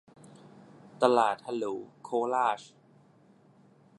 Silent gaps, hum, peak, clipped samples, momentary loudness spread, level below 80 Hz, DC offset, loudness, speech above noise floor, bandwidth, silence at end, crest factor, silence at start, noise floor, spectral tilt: none; none; -6 dBFS; under 0.1%; 13 LU; -86 dBFS; under 0.1%; -29 LUFS; 33 dB; 11.5 kHz; 1.35 s; 26 dB; 1 s; -61 dBFS; -5 dB/octave